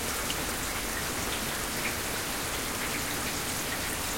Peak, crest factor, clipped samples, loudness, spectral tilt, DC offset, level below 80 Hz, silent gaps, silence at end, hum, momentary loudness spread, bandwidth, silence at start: -16 dBFS; 16 dB; under 0.1%; -30 LUFS; -2 dB/octave; under 0.1%; -46 dBFS; none; 0 s; none; 1 LU; 17 kHz; 0 s